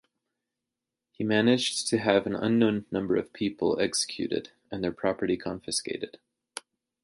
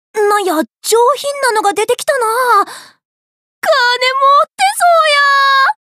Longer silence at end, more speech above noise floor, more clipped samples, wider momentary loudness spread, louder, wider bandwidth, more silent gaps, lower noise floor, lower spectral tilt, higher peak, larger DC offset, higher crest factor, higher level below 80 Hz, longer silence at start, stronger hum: first, 0.45 s vs 0.15 s; second, 60 dB vs over 78 dB; neither; first, 14 LU vs 6 LU; second, -28 LUFS vs -11 LUFS; second, 11.5 kHz vs 15.5 kHz; second, none vs 3.05-3.62 s; about the same, -88 dBFS vs under -90 dBFS; first, -4 dB/octave vs 0 dB/octave; second, -6 dBFS vs -2 dBFS; neither; first, 22 dB vs 10 dB; first, -62 dBFS vs -76 dBFS; first, 1.2 s vs 0.15 s; neither